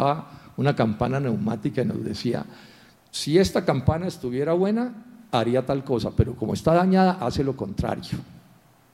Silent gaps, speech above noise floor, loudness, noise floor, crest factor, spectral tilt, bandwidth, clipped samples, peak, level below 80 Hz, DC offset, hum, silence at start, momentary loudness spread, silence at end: none; 32 dB; -24 LUFS; -55 dBFS; 18 dB; -7 dB/octave; 13.5 kHz; under 0.1%; -6 dBFS; -44 dBFS; under 0.1%; none; 0 s; 11 LU; 0.55 s